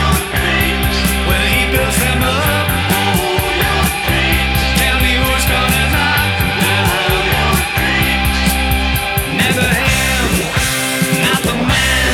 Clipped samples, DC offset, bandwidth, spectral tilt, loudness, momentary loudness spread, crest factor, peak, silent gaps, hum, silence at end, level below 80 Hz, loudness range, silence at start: under 0.1%; under 0.1%; 18.5 kHz; -3.5 dB/octave; -13 LUFS; 2 LU; 12 dB; 0 dBFS; none; none; 0 s; -22 dBFS; 1 LU; 0 s